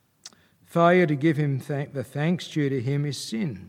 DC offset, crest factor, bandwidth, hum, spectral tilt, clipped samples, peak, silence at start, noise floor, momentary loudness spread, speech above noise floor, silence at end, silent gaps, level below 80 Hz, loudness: under 0.1%; 20 dB; 15 kHz; none; -6.5 dB/octave; under 0.1%; -6 dBFS; 0.25 s; -51 dBFS; 11 LU; 27 dB; 0 s; none; -68 dBFS; -25 LUFS